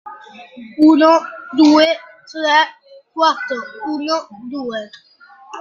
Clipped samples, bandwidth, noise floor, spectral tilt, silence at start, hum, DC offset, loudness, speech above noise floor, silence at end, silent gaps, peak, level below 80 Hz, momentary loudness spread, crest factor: under 0.1%; 7.2 kHz; -37 dBFS; -3 dB/octave; 0.05 s; none; under 0.1%; -15 LUFS; 22 dB; 0 s; none; -2 dBFS; -66 dBFS; 22 LU; 16 dB